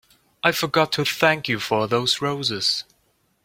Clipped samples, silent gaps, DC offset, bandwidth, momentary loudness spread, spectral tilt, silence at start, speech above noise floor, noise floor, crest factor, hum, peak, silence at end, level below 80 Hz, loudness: under 0.1%; none; under 0.1%; 16.5 kHz; 4 LU; -3.5 dB/octave; 0.45 s; 44 dB; -66 dBFS; 22 dB; none; -2 dBFS; 0.6 s; -60 dBFS; -21 LUFS